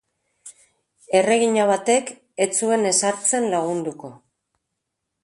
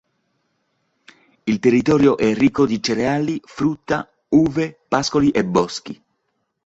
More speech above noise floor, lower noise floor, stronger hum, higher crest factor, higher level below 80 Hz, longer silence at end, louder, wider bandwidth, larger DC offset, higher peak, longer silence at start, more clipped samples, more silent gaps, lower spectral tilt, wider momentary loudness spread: first, 59 dB vs 54 dB; first, -79 dBFS vs -72 dBFS; neither; about the same, 20 dB vs 18 dB; second, -70 dBFS vs -50 dBFS; first, 1.1 s vs 0.7 s; about the same, -20 LUFS vs -19 LUFS; first, 11.5 kHz vs 8 kHz; neither; about the same, -4 dBFS vs -2 dBFS; second, 0.45 s vs 1.45 s; neither; neither; second, -3 dB/octave vs -6 dB/octave; first, 13 LU vs 10 LU